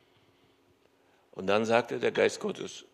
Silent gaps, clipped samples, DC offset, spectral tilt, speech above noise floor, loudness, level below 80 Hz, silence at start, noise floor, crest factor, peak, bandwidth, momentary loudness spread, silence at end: none; under 0.1%; under 0.1%; -4.5 dB/octave; 37 dB; -29 LUFS; -78 dBFS; 1.35 s; -66 dBFS; 24 dB; -8 dBFS; 13 kHz; 13 LU; 0.1 s